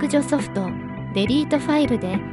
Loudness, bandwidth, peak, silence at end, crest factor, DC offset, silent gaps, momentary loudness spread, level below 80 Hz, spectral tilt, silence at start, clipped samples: -22 LUFS; 11.5 kHz; -6 dBFS; 0 s; 16 dB; under 0.1%; none; 7 LU; -46 dBFS; -6 dB/octave; 0 s; under 0.1%